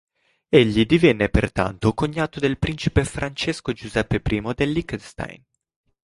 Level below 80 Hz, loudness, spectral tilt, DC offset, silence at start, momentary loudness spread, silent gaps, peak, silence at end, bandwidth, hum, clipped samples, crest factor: -36 dBFS; -21 LUFS; -6 dB/octave; under 0.1%; 0.5 s; 12 LU; none; -2 dBFS; 0.7 s; 11.5 kHz; none; under 0.1%; 20 dB